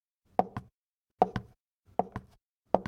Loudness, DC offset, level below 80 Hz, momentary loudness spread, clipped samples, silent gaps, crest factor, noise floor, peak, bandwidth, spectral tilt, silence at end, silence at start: -34 LUFS; under 0.1%; -58 dBFS; 13 LU; under 0.1%; 0.74-1.05 s, 1.12-1.16 s, 1.60-1.66 s, 1.73-1.78 s, 2.49-2.61 s; 28 dB; -86 dBFS; -6 dBFS; 9.8 kHz; -8 dB/octave; 0.05 s; 0.4 s